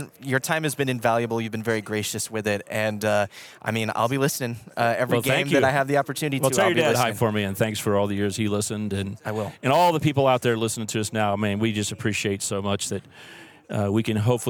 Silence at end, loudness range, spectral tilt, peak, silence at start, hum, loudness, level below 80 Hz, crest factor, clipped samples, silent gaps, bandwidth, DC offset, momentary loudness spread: 0 s; 4 LU; -4.5 dB/octave; -6 dBFS; 0 s; none; -24 LUFS; -66 dBFS; 18 dB; under 0.1%; none; 19.5 kHz; under 0.1%; 9 LU